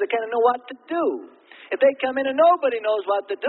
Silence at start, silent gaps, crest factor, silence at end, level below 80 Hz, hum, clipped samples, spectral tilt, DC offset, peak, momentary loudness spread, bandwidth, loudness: 0 s; none; 16 dB; 0 s; -74 dBFS; none; under 0.1%; -8 dB/octave; under 0.1%; -6 dBFS; 12 LU; 4.2 kHz; -21 LUFS